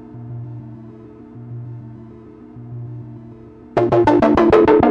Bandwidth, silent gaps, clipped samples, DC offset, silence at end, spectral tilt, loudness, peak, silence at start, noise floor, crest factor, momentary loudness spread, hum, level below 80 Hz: 7.4 kHz; none; under 0.1%; under 0.1%; 0 s; -8.5 dB/octave; -14 LUFS; 0 dBFS; 0.15 s; -39 dBFS; 18 dB; 26 LU; none; -42 dBFS